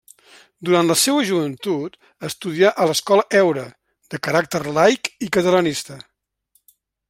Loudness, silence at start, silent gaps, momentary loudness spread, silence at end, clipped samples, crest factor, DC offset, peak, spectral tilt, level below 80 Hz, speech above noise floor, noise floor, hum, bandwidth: -18 LUFS; 0.6 s; none; 15 LU; 1.1 s; under 0.1%; 20 dB; under 0.1%; 0 dBFS; -4 dB/octave; -62 dBFS; 46 dB; -65 dBFS; none; 16.5 kHz